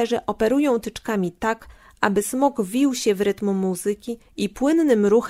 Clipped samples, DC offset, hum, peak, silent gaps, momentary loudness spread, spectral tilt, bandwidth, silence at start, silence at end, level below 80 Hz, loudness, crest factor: under 0.1%; under 0.1%; none; -2 dBFS; none; 9 LU; -5 dB/octave; 16 kHz; 0 s; 0 s; -52 dBFS; -22 LUFS; 18 dB